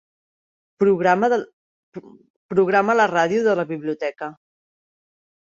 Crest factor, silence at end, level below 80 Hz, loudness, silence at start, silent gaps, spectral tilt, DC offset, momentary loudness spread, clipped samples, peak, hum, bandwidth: 18 dB; 1.25 s; -68 dBFS; -20 LUFS; 0.8 s; 1.53-1.92 s, 2.30-2.49 s; -6 dB/octave; under 0.1%; 23 LU; under 0.1%; -4 dBFS; none; 7.4 kHz